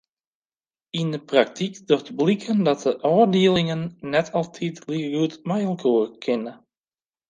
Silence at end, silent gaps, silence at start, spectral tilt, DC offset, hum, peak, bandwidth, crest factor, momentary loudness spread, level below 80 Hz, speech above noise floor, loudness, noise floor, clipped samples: 0.75 s; none; 0.95 s; -6.5 dB/octave; under 0.1%; none; -4 dBFS; 9.4 kHz; 20 dB; 10 LU; -64 dBFS; over 68 dB; -22 LUFS; under -90 dBFS; under 0.1%